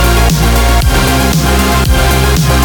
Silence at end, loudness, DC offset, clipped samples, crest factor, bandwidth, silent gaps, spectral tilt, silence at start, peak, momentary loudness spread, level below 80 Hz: 0 s; -10 LUFS; under 0.1%; under 0.1%; 8 dB; over 20 kHz; none; -4.5 dB/octave; 0 s; 0 dBFS; 0 LU; -12 dBFS